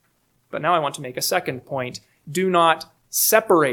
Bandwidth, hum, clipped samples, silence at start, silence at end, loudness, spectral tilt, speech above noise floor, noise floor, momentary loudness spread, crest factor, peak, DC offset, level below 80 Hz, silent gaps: 19 kHz; none; under 0.1%; 0.55 s; 0 s; -21 LUFS; -3 dB/octave; 45 dB; -65 dBFS; 13 LU; 20 dB; -2 dBFS; under 0.1%; -68 dBFS; none